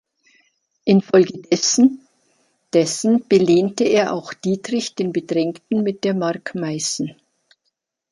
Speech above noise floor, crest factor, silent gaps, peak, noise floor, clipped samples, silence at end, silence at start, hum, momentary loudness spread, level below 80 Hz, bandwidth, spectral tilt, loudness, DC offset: 56 dB; 18 dB; none; -2 dBFS; -74 dBFS; under 0.1%; 1 s; 0.85 s; none; 10 LU; -64 dBFS; 11.5 kHz; -4.5 dB/octave; -19 LUFS; under 0.1%